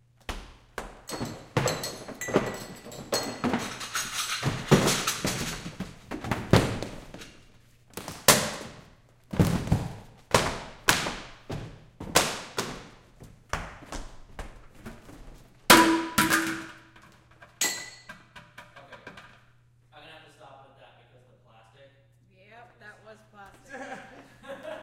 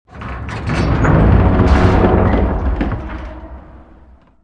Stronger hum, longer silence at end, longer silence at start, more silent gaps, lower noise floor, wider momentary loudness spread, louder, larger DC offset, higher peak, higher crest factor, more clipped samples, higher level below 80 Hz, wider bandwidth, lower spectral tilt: neither; second, 0 s vs 0.65 s; first, 0.3 s vs 0.15 s; neither; first, -60 dBFS vs -44 dBFS; first, 24 LU vs 18 LU; second, -26 LUFS vs -14 LUFS; second, under 0.1% vs 0.2%; about the same, -2 dBFS vs 0 dBFS; first, 30 dB vs 14 dB; neither; second, -48 dBFS vs -20 dBFS; first, 17 kHz vs 8.6 kHz; second, -3.5 dB/octave vs -8.5 dB/octave